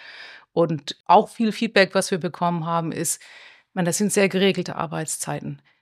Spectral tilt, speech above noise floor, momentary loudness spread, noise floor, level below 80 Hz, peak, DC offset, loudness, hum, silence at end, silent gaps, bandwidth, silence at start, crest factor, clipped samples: -4 dB/octave; 21 dB; 12 LU; -43 dBFS; -68 dBFS; -2 dBFS; under 0.1%; -22 LUFS; none; 0.25 s; 1.00-1.04 s; 15.5 kHz; 0 s; 20 dB; under 0.1%